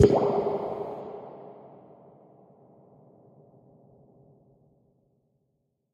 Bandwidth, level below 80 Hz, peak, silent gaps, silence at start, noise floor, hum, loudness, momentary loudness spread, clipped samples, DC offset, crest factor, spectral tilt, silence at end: 9 kHz; -54 dBFS; -4 dBFS; none; 0 s; -76 dBFS; none; -28 LUFS; 28 LU; under 0.1%; under 0.1%; 26 dB; -8 dB/octave; 4.25 s